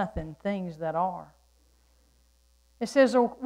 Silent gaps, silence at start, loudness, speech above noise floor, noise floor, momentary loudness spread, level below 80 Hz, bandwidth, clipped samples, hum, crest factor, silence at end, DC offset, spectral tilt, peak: none; 0 s; -28 LUFS; 37 dB; -64 dBFS; 13 LU; -52 dBFS; 12 kHz; under 0.1%; 60 Hz at -60 dBFS; 20 dB; 0 s; under 0.1%; -6 dB/octave; -10 dBFS